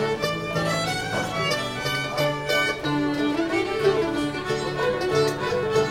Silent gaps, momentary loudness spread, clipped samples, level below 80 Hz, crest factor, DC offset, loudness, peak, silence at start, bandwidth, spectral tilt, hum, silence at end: none; 4 LU; under 0.1%; -50 dBFS; 16 dB; under 0.1%; -24 LUFS; -8 dBFS; 0 s; 17 kHz; -4.5 dB/octave; none; 0 s